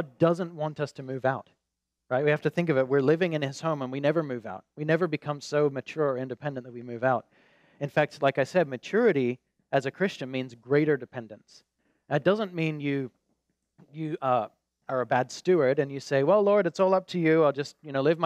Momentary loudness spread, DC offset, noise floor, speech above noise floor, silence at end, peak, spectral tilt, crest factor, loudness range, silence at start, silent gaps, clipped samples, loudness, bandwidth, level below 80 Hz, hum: 12 LU; under 0.1%; -84 dBFS; 57 dB; 0 s; -10 dBFS; -7 dB/octave; 18 dB; 5 LU; 0 s; none; under 0.1%; -27 LUFS; 11 kHz; -78 dBFS; none